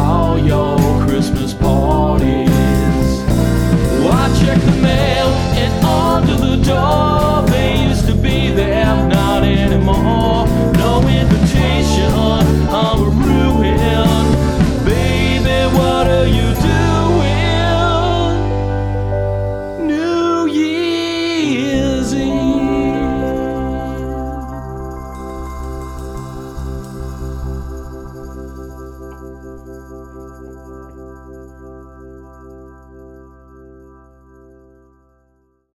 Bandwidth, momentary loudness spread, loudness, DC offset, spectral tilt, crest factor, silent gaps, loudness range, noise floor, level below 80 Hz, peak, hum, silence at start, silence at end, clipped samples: 18.5 kHz; 18 LU; -14 LUFS; under 0.1%; -6.5 dB/octave; 14 dB; none; 16 LU; -59 dBFS; -22 dBFS; -2 dBFS; none; 0 s; 2.55 s; under 0.1%